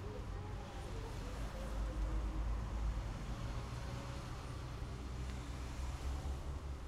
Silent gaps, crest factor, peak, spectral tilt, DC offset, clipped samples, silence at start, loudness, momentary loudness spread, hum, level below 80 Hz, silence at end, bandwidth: none; 14 dB; -30 dBFS; -6 dB/octave; under 0.1%; under 0.1%; 0 s; -45 LUFS; 5 LU; none; -44 dBFS; 0 s; 13 kHz